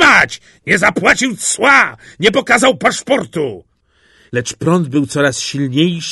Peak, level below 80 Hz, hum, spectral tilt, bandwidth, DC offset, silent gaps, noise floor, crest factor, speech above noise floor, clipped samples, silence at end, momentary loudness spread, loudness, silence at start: 0 dBFS; -48 dBFS; none; -3.5 dB/octave; 12 kHz; under 0.1%; none; -54 dBFS; 14 dB; 40 dB; under 0.1%; 0 s; 11 LU; -13 LUFS; 0 s